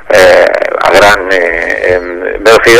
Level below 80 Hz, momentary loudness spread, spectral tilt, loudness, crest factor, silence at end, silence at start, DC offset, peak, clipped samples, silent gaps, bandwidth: -32 dBFS; 7 LU; -3 dB/octave; -7 LUFS; 6 dB; 0 s; 0 s; under 0.1%; 0 dBFS; 7%; none; 17 kHz